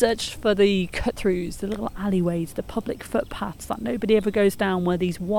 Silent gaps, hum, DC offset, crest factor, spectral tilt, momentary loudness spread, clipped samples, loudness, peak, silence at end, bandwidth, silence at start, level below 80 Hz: none; none; under 0.1%; 18 dB; -6 dB/octave; 10 LU; under 0.1%; -24 LUFS; -6 dBFS; 0 s; 18.5 kHz; 0 s; -42 dBFS